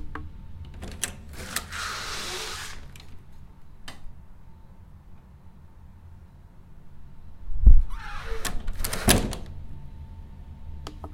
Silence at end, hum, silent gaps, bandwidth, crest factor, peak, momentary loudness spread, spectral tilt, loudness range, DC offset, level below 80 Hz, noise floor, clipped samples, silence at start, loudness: 0 s; none; none; 16.5 kHz; 24 dB; -2 dBFS; 29 LU; -3.5 dB/octave; 23 LU; under 0.1%; -28 dBFS; -47 dBFS; under 0.1%; 0 s; -28 LUFS